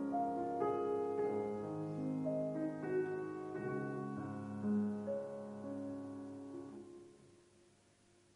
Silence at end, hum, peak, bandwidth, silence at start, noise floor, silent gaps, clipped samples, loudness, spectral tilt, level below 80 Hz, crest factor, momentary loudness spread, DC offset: 1 s; none; -24 dBFS; 10.5 kHz; 0 s; -69 dBFS; none; under 0.1%; -41 LUFS; -8.5 dB/octave; -78 dBFS; 16 dB; 12 LU; under 0.1%